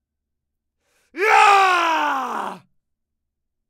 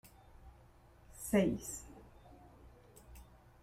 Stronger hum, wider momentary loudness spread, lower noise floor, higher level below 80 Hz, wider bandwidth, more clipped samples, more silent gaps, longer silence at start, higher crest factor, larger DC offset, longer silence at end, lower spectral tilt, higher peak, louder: neither; second, 15 LU vs 28 LU; first, -80 dBFS vs -62 dBFS; second, -72 dBFS vs -60 dBFS; about the same, 16 kHz vs 16 kHz; neither; neither; first, 1.15 s vs 0.45 s; about the same, 20 dB vs 24 dB; neither; first, 1.1 s vs 0.4 s; second, -1 dB/octave vs -5.5 dB/octave; first, -2 dBFS vs -18 dBFS; first, -16 LUFS vs -36 LUFS